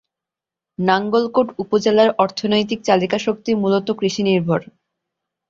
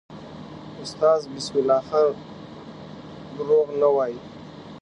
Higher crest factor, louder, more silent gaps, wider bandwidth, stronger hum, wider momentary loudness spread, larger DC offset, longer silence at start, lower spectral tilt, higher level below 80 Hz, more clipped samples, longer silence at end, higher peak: about the same, 18 dB vs 18 dB; first, -18 LUFS vs -22 LUFS; neither; second, 7.6 kHz vs 10.5 kHz; neither; second, 6 LU vs 20 LU; neither; first, 0.8 s vs 0.1 s; about the same, -5.5 dB/octave vs -5.5 dB/octave; about the same, -60 dBFS vs -60 dBFS; neither; first, 0.85 s vs 0 s; first, -2 dBFS vs -6 dBFS